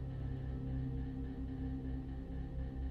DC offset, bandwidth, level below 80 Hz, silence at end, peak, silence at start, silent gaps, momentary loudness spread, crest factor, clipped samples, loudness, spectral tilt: under 0.1%; 4.7 kHz; -44 dBFS; 0 s; -30 dBFS; 0 s; none; 4 LU; 12 dB; under 0.1%; -43 LUFS; -10 dB/octave